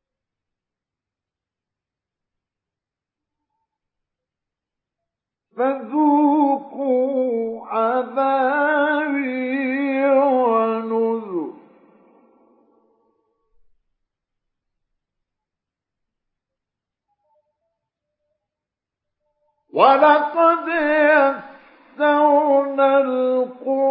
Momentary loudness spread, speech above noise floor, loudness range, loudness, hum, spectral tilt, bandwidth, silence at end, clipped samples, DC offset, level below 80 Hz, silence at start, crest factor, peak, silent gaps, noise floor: 8 LU; 70 dB; 10 LU; -18 LUFS; none; -9 dB/octave; 5.2 kHz; 0 s; under 0.1%; under 0.1%; -76 dBFS; 5.55 s; 20 dB; -2 dBFS; none; -88 dBFS